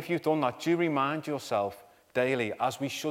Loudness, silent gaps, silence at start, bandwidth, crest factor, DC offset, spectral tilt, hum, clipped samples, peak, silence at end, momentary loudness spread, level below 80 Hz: -30 LUFS; none; 0 s; 16 kHz; 16 dB; under 0.1%; -5.5 dB/octave; none; under 0.1%; -12 dBFS; 0 s; 6 LU; -74 dBFS